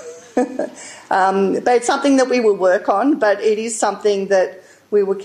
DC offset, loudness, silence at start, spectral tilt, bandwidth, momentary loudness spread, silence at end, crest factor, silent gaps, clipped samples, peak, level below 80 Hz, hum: under 0.1%; -17 LUFS; 0 s; -4 dB/octave; 11 kHz; 8 LU; 0 s; 12 dB; none; under 0.1%; -4 dBFS; -66 dBFS; none